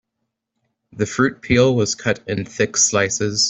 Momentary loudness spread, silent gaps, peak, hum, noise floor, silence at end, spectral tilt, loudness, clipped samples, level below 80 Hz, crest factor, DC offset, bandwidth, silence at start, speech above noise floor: 9 LU; none; -2 dBFS; none; -77 dBFS; 0 s; -3.5 dB/octave; -18 LUFS; under 0.1%; -50 dBFS; 18 dB; under 0.1%; 8.4 kHz; 0.95 s; 59 dB